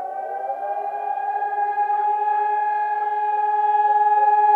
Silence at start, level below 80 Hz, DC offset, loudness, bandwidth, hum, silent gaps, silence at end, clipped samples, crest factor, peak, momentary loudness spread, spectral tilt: 0 s; under -90 dBFS; under 0.1%; -21 LUFS; 4 kHz; none; none; 0 s; under 0.1%; 12 dB; -8 dBFS; 10 LU; -3.5 dB/octave